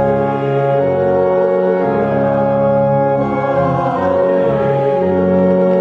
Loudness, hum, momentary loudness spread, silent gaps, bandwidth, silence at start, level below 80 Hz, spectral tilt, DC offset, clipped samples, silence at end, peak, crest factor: -14 LUFS; none; 3 LU; none; 4.9 kHz; 0 s; -44 dBFS; -10 dB/octave; under 0.1%; under 0.1%; 0 s; -4 dBFS; 10 dB